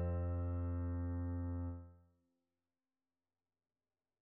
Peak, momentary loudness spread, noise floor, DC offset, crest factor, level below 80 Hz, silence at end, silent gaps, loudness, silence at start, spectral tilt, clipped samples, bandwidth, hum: -32 dBFS; 9 LU; under -90 dBFS; under 0.1%; 12 dB; -52 dBFS; 2.25 s; none; -42 LUFS; 0 s; -12 dB/octave; under 0.1%; 2.8 kHz; none